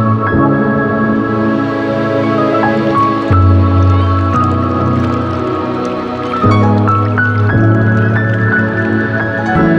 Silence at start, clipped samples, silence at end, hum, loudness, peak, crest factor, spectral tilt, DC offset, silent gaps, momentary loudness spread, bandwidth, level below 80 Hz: 0 s; under 0.1%; 0 s; none; -12 LUFS; 0 dBFS; 12 dB; -9 dB/octave; under 0.1%; none; 5 LU; 6.8 kHz; -34 dBFS